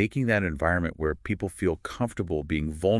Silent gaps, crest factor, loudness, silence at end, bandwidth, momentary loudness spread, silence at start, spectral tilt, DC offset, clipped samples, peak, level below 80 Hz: none; 18 dB; -28 LUFS; 0 s; 12 kHz; 6 LU; 0 s; -7 dB/octave; under 0.1%; under 0.1%; -8 dBFS; -44 dBFS